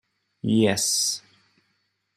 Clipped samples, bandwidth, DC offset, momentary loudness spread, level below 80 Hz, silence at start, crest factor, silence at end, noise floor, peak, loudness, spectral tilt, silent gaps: under 0.1%; 15.5 kHz; under 0.1%; 13 LU; -68 dBFS; 0.45 s; 20 dB; 1 s; -73 dBFS; -6 dBFS; -23 LUFS; -3.5 dB/octave; none